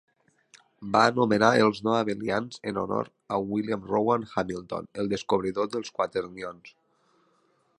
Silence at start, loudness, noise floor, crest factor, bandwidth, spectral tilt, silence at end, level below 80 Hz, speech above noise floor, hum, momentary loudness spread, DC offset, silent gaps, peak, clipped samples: 0.55 s; -27 LUFS; -68 dBFS; 24 dB; 11.5 kHz; -5.5 dB/octave; 1.1 s; -62 dBFS; 41 dB; none; 12 LU; under 0.1%; none; -4 dBFS; under 0.1%